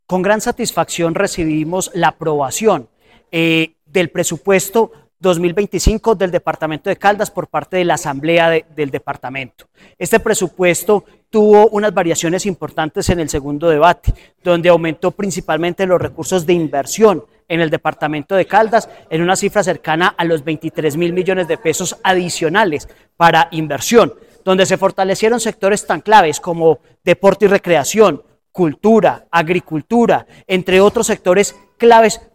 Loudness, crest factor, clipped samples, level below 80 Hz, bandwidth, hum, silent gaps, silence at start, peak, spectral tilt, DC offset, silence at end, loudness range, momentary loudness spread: -15 LUFS; 14 dB; under 0.1%; -36 dBFS; 16.5 kHz; none; none; 0.1 s; 0 dBFS; -4.5 dB/octave; 0.1%; 0.15 s; 3 LU; 9 LU